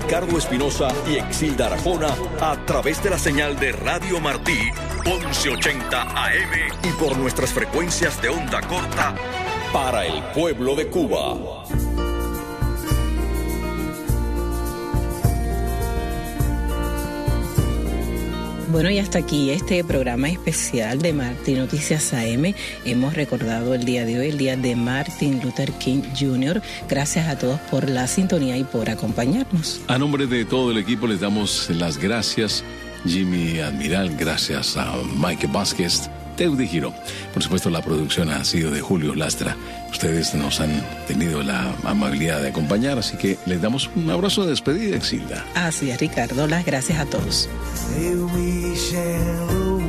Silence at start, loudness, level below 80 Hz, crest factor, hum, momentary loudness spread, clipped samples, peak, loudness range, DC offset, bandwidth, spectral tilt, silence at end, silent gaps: 0 s; -22 LUFS; -32 dBFS; 16 dB; none; 5 LU; under 0.1%; -6 dBFS; 3 LU; under 0.1%; 14.5 kHz; -4.5 dB/octave; 0 s; none